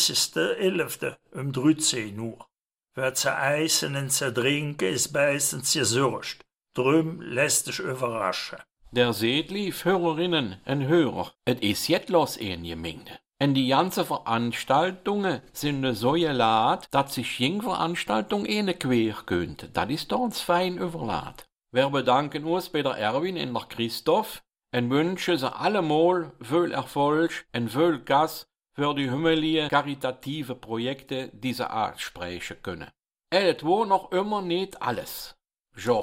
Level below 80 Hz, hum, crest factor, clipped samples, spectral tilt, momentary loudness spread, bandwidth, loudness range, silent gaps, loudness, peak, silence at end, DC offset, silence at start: -58 dBFS; none; 18 dB; under 0.1%; -4 dB/octave; 11 LU; 16 kHz; 3 LU; 35.60-35.64 s; -26 LUFS; -8 dBFS; 0 s; under 0.1%; 0 s